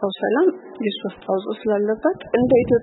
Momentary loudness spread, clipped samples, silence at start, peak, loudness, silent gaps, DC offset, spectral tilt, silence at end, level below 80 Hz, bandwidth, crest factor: 9 LU; under 0.1%; 0 s; -4 dBFS; -21 LUFS; none; under 0.1%; -11 dB/octave; 0 s; -52 dBFS; 4.1 kHz; 16 dB